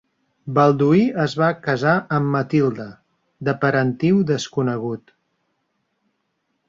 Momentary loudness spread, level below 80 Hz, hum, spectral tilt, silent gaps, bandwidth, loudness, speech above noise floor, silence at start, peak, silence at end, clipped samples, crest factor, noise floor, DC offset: 12 LU; -60 dBFS; none; -7 dB/octave; none; 7.6 kHz; -19 LUFS; 53 dB; 0.45 s; -2 dBFS; 1.7 s; under 0.1%; 18 dB; -72 dBFS; under 0.1%